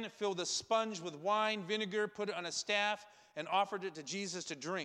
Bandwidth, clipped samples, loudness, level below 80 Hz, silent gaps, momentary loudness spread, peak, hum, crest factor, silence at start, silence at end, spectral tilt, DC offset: 12 kHz; under 0.1%; -37 LUFS; -84 dBFS; none; 8 LU; -20 dBFS; none; 18 dB; 0 s; 0 s; -2.5 dB/octave; under 0.1%